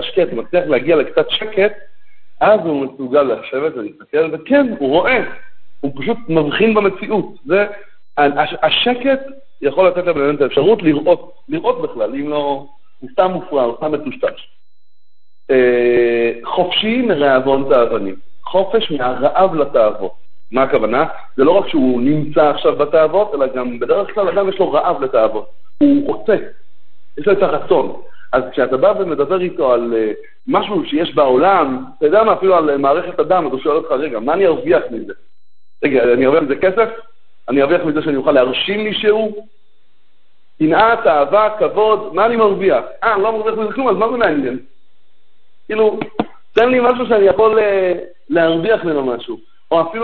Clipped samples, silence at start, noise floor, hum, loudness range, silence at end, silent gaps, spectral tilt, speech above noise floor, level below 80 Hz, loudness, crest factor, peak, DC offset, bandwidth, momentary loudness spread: under 0.1%; 0 s; -70 dBFS; none; 3 LU; 0 s; none; -8.5 dB/octave; 55 dB; -52 dBFS; -15 LUFS; 16 dB; 0 dBFS; under 0.1%; 4.5 kHz; 9 LU